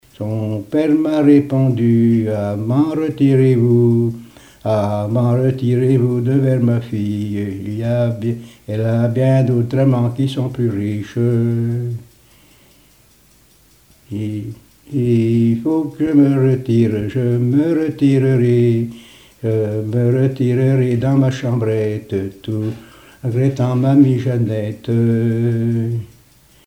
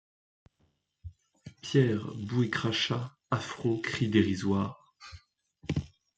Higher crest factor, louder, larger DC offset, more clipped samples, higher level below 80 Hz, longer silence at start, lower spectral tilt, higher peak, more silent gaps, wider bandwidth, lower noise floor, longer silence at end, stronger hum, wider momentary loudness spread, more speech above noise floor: second, 16 dB vs 22 dB; first, -16 LUFS vs -30 LUFS; neither; neither; first, -52 dBFS vs -60 dBFS; second, 0.2 s vs 1.05 s; first, -9 dB/octave vs -6 dB/octave; first, 0 dBFS vs -10 dBFS; neither; first, 10 kHz vs 8.8 kHz; second, -51 dBFS vs -74 dBFS; first, 0.6 s vs 0.3 s; neither; second, 11 LU vs 23 LU; second, 36 dB vs 45 dB